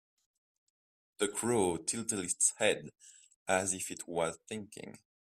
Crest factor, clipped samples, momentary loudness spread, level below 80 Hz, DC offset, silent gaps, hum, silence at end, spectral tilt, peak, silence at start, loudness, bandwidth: 22 dB; under 0.1%; 18 LU; -72 dBFS; under 0.1%; 3.36-3.46 s; none; 0.35 s; -2.5 dB/octave; -14 dBFS; 1.2 s; -33 LUFS; 15.5 kHz